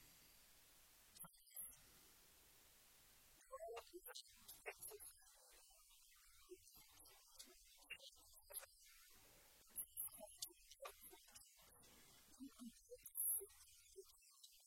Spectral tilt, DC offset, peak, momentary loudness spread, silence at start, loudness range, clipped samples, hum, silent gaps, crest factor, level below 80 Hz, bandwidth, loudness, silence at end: -0.5 dB/octave; under 0.1%; -32 dBFS; 17 LU; 0 s; 11 LU; under 0.1%; none; none; 26 dB; -80 dBFS; 16.5 kHz; -54 LUFS; 0 s